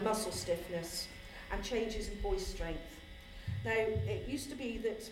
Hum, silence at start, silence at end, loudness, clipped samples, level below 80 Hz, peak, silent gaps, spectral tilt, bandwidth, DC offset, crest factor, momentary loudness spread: none; 0 s; 0 s; -38 LUFS; under 0.1%; -48 dBFS; -20 dBFS; none; -4.5 dB/octave; 16.5 kHz; under 0.1%; 18 dB; 12 LU